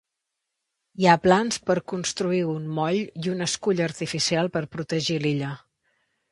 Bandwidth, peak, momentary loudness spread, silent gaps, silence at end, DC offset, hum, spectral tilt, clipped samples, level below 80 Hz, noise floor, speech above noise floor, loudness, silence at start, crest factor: 11.5 kHz; -2 dBFS; 10 LU; none; 0.75 s; under 0.1%; none; -4.5 dB/octave; under 0.1%; -60 dBFS; -82 dBFS; 59 dB; -24 LUFS; 1 s; 24 dB